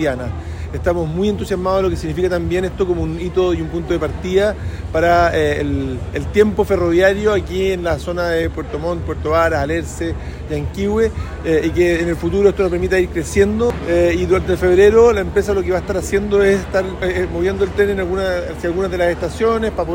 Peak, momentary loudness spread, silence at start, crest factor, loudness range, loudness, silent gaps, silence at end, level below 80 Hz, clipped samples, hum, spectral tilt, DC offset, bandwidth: 0 dBFS; 9 LU; 0 s; 16 dB; 5 LU; -17 LUFS; none; 0 s; -30 dBFS; under 0.1%; none; -6.5 dB/octave; under 0.1%; 16.5 kHz